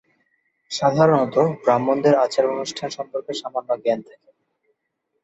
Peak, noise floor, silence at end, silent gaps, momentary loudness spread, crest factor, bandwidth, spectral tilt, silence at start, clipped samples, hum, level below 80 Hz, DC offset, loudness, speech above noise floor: -4 dBFS; -75 dBFS; 1.2 s; none; 11 LU; 18 dB; 8.2 kHz; -5.5 dB/octave; 0.7 s; under 0.1%; none; -66 dBFS; under 0.1%; -21 LUFS; 55 dB